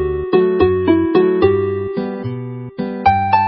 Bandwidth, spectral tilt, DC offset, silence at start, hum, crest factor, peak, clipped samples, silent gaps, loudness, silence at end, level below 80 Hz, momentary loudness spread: 5.6 kHz; -12.5 dB/octave; under 0.1%; 0 s; none; 14 dB; 0 dBFS; under 0.1%; none; -16 LUFS; 0 s; -36 dBFS; 12 LU